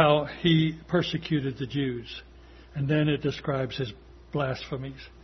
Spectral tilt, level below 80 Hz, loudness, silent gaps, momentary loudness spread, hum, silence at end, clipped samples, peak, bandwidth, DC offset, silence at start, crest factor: -7.5 dB/octave; -52 dBFS; -28 LUFS; none; 13 LU; none; 0 s; under 0.1%; -4 dBFS; 6.4 kHz; under 0.1%; 0 s; 22 dB